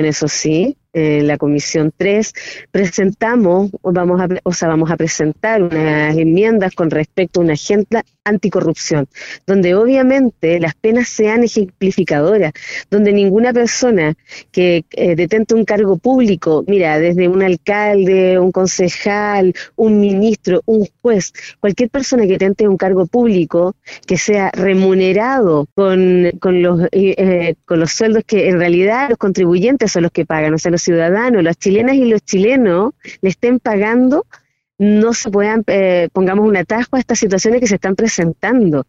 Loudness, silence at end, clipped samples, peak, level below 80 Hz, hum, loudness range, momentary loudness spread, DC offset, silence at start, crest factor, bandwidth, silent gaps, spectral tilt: -13 LUFS; 0.05 s; under 0.1%; -4 dBFS; -48 dBFS; none; 2 LU; 5 LU; under 0.1%; 0 s; 10 dB; 8 kHz; 25.72-25.76 s; -5.5 dB/octave